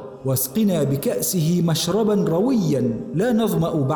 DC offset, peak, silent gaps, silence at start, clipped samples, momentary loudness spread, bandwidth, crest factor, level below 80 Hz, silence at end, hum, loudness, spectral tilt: under 0.1%; -10 dBFS; none; 0 s; under 0.1%; 3 LU; 19.5 kHz; 10 dB; -52 dBFS; 0 s; none; -20 LUFS; -6 dB/octave